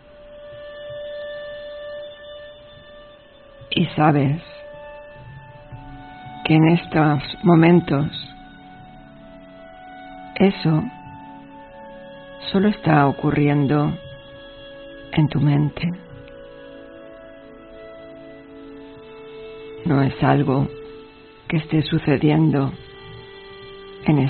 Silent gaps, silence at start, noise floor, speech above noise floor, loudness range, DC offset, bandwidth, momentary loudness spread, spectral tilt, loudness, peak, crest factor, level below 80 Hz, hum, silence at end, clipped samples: none; 0.25 s; -46 dBFS; 29 dB; 13 LU; under 0.1%; 4.5 kHz; 24 LU; -6.5 dB/octave; -19 LUFS; -2 dBFS; 20 dB; -48 dBFS; none; 0 s; under 0.1%